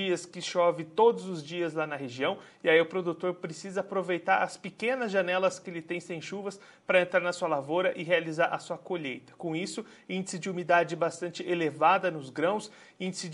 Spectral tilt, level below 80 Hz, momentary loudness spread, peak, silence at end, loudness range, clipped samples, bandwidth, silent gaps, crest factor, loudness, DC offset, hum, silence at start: -4.5 dB/octave; -82 dBFS; 12 LU; -8 dBFS; 0 s; 3 LU; under 0.1%; 11.5 kHz; none; 22 dB; -30 LUFS; under 0.1%; none; 0 s